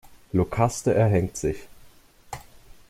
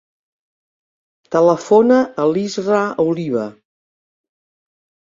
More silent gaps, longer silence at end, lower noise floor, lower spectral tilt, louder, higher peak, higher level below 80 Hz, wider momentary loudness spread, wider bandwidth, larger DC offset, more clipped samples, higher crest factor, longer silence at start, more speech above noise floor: neither; second, 0.35 s vs 1.55 s; second, -52 dBFS vs under -90 dBFS; about the same, -6.5 dB/octave vs -6.5 dB/octave; second, -24 LUFS vs -16 LUFS; second, -8 dBFS vs -2 dBFS; first, -46 dBFS vs -64 dBFS; first, 20 LU vs 10 LU; first, 15.5 kHz vs 7.8 kHz; neither; neither; about the same, 18 dB vs 16 dB; second, 0.05 s vs 1.3 s; second, 29 dB vs over 75 dB